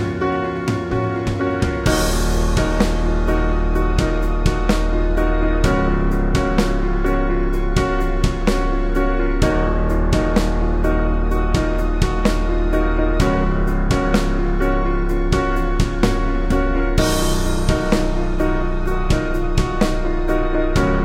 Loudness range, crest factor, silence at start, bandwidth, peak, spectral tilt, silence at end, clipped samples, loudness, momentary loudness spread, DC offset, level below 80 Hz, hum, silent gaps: 1 LU; 16 dB; 0 s; 14.5 kHz; 0 dBFS; -6 dB/octave; 0 s; under 0.1%; -20 LUFS; 3 LU; under 0.1%; -20 dBFS; none; none